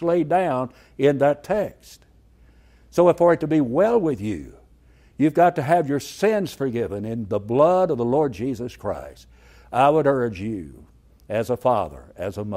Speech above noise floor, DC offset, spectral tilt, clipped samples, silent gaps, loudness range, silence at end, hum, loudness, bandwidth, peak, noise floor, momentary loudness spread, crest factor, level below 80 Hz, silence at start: 32 dB; under 0.1%; -7 dB/octave; under 0.1%; none; 3 LU; 0 s; none; -21 LUFS; 16 kHz; -4 dBFS; -53 dBFS; 13 LU; 18 dB; -52 dBFS; 0 s